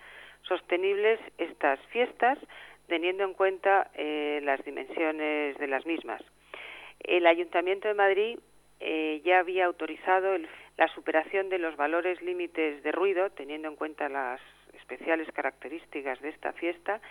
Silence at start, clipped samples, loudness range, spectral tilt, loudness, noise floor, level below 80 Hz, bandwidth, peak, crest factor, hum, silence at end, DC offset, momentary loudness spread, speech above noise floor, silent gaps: 0 s; under 0.1%; 5 LU; -4 dB/octave; -29 LUFS; -48 dBFS; -70 dBFS; 10.5 kHz; -8 dBFS; 22 dB; 50 Hz at -70 dBFS; 0 s; under 0.1%; 15 LU; 19 dB; none